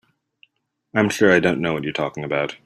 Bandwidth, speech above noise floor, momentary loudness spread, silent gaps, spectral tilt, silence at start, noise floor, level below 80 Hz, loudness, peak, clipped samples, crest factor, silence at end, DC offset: 13.5 kHz; 39 dB; 10 LU; none; -5.5 dB/octave; 0.95 s; -59 dBFS; -58 dBFS; -20 LUFS; -2 dBFS; under 0.1%; 20 dB; 0.1 s; under 0.1%